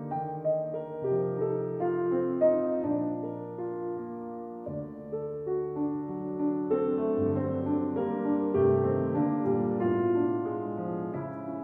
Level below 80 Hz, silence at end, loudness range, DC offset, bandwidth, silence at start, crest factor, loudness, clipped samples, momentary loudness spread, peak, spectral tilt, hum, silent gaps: -66 dBFS; 0 s; 6 LU; under 0.1%; 3.5 kHz; 0 s; 16 dB; -30 LUFS; under 0.1%; 11 LU; -14 dBFS; -12 dB/octave; none; none